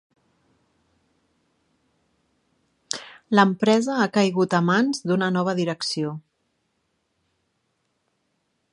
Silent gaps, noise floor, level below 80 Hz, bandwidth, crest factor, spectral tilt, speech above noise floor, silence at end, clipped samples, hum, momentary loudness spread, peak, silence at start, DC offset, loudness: none; -73 dBFS; -72 dBFS; 11.5 kHz; 24 dB; -5.5 dB/octave; 52 dB; 2.55 s; under 0.1%; none; 13 LU; -2 dBFS; 2.9 s; under 0.1%; -22 LUFS